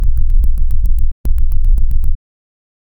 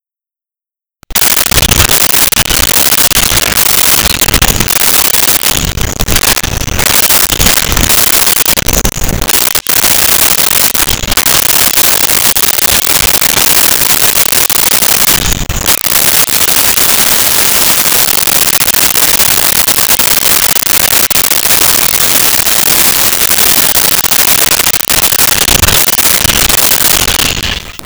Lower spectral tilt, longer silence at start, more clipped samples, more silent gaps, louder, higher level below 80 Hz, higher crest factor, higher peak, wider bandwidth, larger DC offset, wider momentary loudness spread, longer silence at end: first, -8.5 dB/octave vs -1 dB/octave; second, 0 s vs 1.1 s; second, under 0.1% vs 0.1%; first, 1.12-1.24 s vs none; second, -19 LUFS vs -5 LUFS; first, -12 dBFS vs -24 dBFS; about the same, 8 dB vs 8 dB; about the same, -2 dBFS vs 0 dBFS; second, 0.6 kHz vs over 20 kHz; neither; about the same, 4 LU vs 4 LU; first, 0.85 s vs 0 s